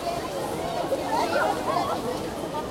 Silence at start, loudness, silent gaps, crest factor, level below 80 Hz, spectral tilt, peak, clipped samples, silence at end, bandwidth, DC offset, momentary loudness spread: 0 s; -27 LUFS; none; 14 dB; -52 dBFS; -4.5 dB/octave; -12 dBFS; under 0.1%; 0 s; 16.5 kHz; under 0.1%; 6 LU